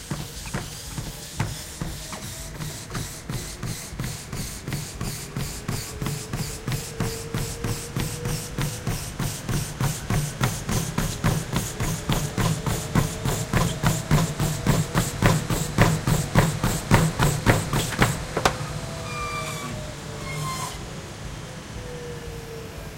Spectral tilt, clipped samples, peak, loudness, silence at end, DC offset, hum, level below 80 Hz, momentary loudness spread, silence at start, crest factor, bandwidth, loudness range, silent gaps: -4.5 dB/octave; under 0.1%; 0 dBFS; -27 LUFS; 0 s; under 0.1%; none; -36 dBFS; 12 LU; 0 s; 26 dB; 17 kHz; 10 LU; none